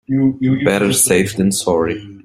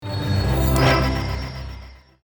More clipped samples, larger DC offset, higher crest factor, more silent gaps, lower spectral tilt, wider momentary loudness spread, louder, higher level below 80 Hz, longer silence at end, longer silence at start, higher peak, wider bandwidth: neither; neither; about the same, 16 dB vs 16 dB; neither; second, -4.5 dB/octave vs -6 dB/octave; second, 5 LU vs 18 LU; first, -15 LUFS vs -20 LUFS; second, -48 dBFS vs -28 dBFS; second, 0.05 s vs 0.3 s; about the same, 0.1 s vs 0 s; first, 0 dBFS vs -6 dBFS; second, 16 kHz vs over 20 kHz